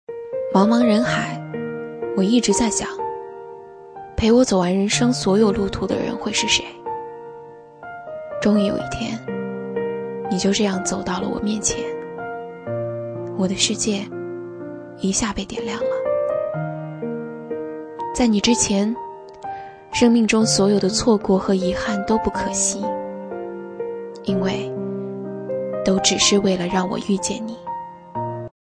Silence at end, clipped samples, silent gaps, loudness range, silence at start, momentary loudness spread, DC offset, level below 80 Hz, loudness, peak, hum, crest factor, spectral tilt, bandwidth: 0.25 s; under 0.1%; none; 6 LU; 0.1 s; 16 LU; under 0.1%; -46 dBFS; -21 LUFS; -2 dBFS; none; 20 dB; -4 dB/octave; 10.5 kHz